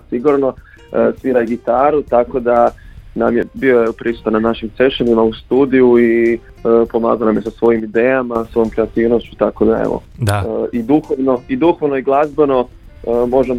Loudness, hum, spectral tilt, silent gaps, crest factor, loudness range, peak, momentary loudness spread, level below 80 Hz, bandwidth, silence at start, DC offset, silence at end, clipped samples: -15 LUFS; none; -7.5 dB/octave; none; 14 dB; 3 LU; 0 dBFS; 6 LU; -38 dBFS; 13.5 kHz; 0.1 s; under 0.1%; 0 s; under 0.1%